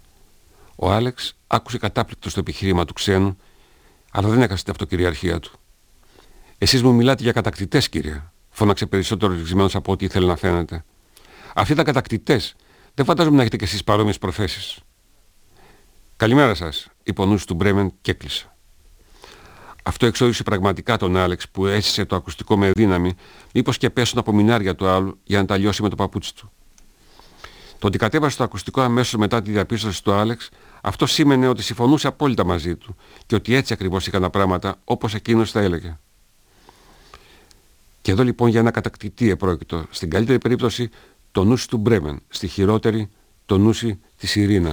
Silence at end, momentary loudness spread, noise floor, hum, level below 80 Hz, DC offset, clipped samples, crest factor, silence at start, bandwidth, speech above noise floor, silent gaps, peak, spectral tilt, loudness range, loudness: 0 s; 11 LU; -56 dBFS; none; -42 dBFS; under 0.1%; under 0.1%; 20 dB; 0.8 s; over 20 kHz; 37 dB; none; 0 dBFS; -5.5 dB/octave; 4 LU; -20 LUFS